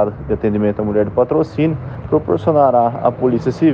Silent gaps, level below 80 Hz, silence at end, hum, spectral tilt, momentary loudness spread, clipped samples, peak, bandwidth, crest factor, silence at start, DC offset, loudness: none; -40 dBFS; 0 s; none; -9.5 dB/octave; 6 LU; under 0.1%; -2 dBFS; 7.2 kHz; 14 dB; 0 s; under 0.1%; -16 LUFS